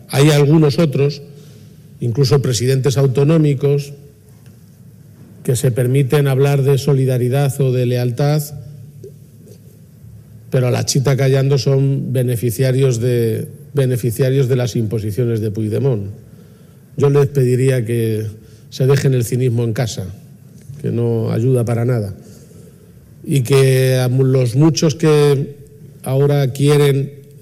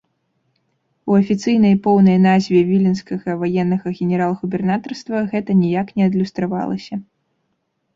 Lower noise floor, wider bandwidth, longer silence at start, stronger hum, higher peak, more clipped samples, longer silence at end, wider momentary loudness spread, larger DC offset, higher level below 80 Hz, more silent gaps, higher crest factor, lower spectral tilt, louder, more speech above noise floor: second, -42 dBFS vs -70 dBFS; first, 15.5 kHz vs 7.6 kHz; second, 0.1 s vs 1.05 s; neither; about the same, 0 dBFS vs -2 dBFS; neither; second, 0.2 s vs 0.95 s; about the same, 12 LU vs 11 LU; neither; about the same, -52 dBFS vs -56 dBFS; neither; about the same, 16 dB vs 14 dB; second, -6.5 dB/octave vs -8 dB/octave; about the same, -15 LUFS vs -17 LUFS; second, 28 dB vs 54 dB